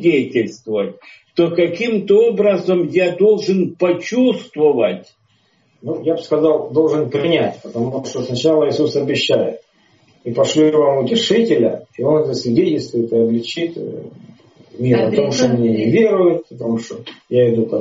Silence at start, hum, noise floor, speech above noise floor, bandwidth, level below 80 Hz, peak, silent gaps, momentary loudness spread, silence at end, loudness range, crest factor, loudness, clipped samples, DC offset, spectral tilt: 0 s; none; -59 dBFS; 43 dB; 7.6 kHz; -58 dBFS; -2 dBFS; none; 10 LU; 0 s; 3 LU; 14 dB; -16 LUFS; under 0.1%; under 0.1%; -5.5 dB/octave